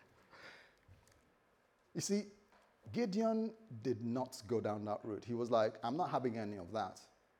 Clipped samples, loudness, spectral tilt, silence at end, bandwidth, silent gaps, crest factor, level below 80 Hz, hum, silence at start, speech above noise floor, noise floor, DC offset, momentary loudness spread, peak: under 0.1%; -40 LUFS; -5.5 dB/octave; 0.35 s; 16.5 kHz; none; 20 dB; -82 dBFS; none; 0.35 s; 35 dB; -74 dBFS; under 0.1%; 17 LU; -20 dBFS